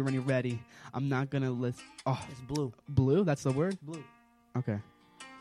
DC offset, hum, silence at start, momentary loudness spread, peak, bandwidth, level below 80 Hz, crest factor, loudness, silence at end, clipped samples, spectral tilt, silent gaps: under 0.1%; none; 0 s; 14 LU; -14 dBFS; 11.5 kHz; -60 dBFS; 20 dB; -33 LUFS; 0 s; under 0.1%; -7.5 dB/octave; none